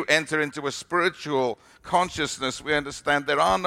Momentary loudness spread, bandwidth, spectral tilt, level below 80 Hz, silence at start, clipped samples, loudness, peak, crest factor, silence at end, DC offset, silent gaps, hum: 7 LU; 16 kHz; -3.5 dB/octave; -54 dBFS; 0 s; under 0.1%; -25 LUFS; -4 dBFS; 20 dB; 0 s; under 0.1%; none; none